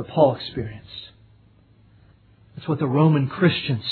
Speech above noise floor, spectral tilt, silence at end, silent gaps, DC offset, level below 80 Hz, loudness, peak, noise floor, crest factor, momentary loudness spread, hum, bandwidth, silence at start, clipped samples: 33 dB; -10 dB/octave; 0 s; none; under 0.1%; -56 dBFS; -21 LUFS; -4 dBFS; -54 dBFS; 20 dB; 19 LU; none; 4.5 kHz; 0 s; under 0.1%